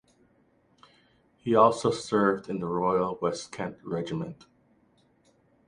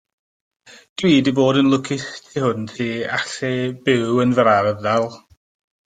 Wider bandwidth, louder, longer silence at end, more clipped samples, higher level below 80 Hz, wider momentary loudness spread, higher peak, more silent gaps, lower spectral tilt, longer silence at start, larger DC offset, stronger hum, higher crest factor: first, 11 kHz vs 9.2 kHz; second, -27 LUFS vs -19 LUFS; first, 1.35 s vs 0.7 s; neither; second, -64 dBFS vs -58 dBFS; first, 15 LU vs 10 LU; second, -6 dBFS vs -2 dBFS; neither; about the same, -6 dB/octave vs -5.5 dB/octave; first, 1.45 s vs 1 s; neither; neither; about the same, 22 dB vs 18 dB